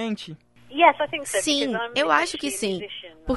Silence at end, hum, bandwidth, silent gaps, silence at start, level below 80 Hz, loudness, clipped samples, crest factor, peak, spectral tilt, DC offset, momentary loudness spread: 0 s; none; 12 kHz; none; 0 s; -48 dBFS; -22 LUFS; under 0.1%; 22 dB; -2 dBFS; -2.5 dB/octave; 0.2%; 16 LU